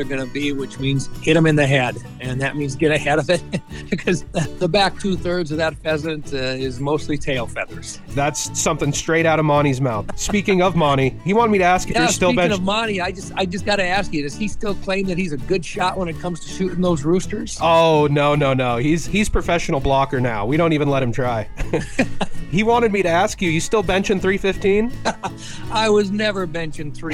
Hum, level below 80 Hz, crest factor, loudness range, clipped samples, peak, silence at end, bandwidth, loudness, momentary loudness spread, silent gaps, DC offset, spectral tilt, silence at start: none; -36 dBFS; 16 dB; 5 LU; under 0.1%; -2 dBFS; 0 s; 15 kHz; -19 LUFS; 9 LU; none; under 0.1%; -5 dB/octave; 0 s